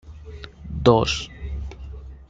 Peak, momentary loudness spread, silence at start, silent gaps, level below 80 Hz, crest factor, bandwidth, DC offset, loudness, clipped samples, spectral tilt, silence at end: -2 dBFS; 22 LU; 0.05 s; none; -36 dBFS; 22 dB; 9.2 kHz; under 0.1%; -21 LUFS; under 0.1%; -5.5 dB/octave; 0.05 s